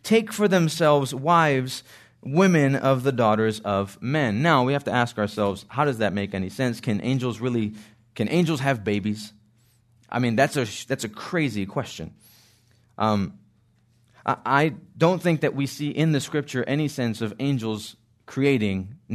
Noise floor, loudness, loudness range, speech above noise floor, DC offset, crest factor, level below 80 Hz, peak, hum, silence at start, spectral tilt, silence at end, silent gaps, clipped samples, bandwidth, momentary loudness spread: -62 dBFS; -24 LUFS; 6 LU; 39 dB; under 0.1%; 20 dB; -64 dBFS; -4 dBFS; none; 0.05 s; -6 dB/octave; 0 s; none; under 0.1%; 13.5 kHz; 11 LU